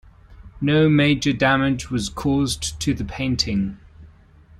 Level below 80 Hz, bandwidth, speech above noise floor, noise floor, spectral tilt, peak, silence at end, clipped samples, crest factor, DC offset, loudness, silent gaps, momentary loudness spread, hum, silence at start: -40 dBFS; 13 kHz; 29 dB; -49 dBFS; -5 dB/octave; -4 dBFS; 0.55 s; under 0.1%; 16 dB; under 0.1%; -20 LUFS; none; 9 LU; none; 0.3 s